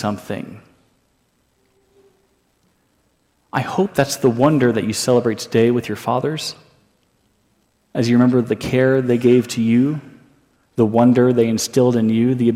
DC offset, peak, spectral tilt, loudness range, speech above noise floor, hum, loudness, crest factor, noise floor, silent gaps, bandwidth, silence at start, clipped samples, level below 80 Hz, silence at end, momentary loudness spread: under 0.1%; -2 dBFS; -6 dB/octave; 9 LU; 47 dB; none; -17 LUFS; 16 dB; -63 dBFS; none; 15.5 kHz; 0 s; under 0.1%; -56 dBFS; 0 s; 12 LU